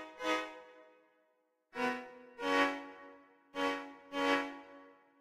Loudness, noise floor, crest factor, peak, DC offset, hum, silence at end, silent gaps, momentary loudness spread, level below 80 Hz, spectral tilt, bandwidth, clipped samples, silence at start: -36 LUFS; -77 dBFS; 20 dB; -18 dBFS; under 0.1%; none; 0.3 s; none; 21 LU; -76 dBFS; -2.5 dB/octave; 15.5 kHz; under 0.1%; 0 s